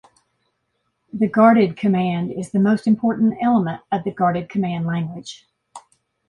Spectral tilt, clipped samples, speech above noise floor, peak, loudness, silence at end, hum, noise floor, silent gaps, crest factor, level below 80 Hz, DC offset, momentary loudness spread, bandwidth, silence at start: -8 dB/octave; under 0.1%; 53 dB; -2 dBFS; -19 LUFS; 0.5 s; none; -72 dBFS; none; 18 dB; -60 dBFS; under 0.1%; 11 LU; 10.5 kHz; 1.15 s